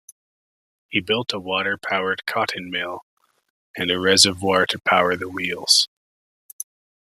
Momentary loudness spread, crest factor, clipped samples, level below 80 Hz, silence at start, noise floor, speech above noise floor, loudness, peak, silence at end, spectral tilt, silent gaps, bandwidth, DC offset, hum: 19 LU; 24 dB; under 0.1%; -66 dBFS; 0.9 s; under -90 dBFS; over 69 dB; -20 LUFS; 0 dBFS; 1.2 s; -2 dB/octave; 3.02-3.17 s, 3.50-3.74 s; 15.5 kHz; under 0.1%; none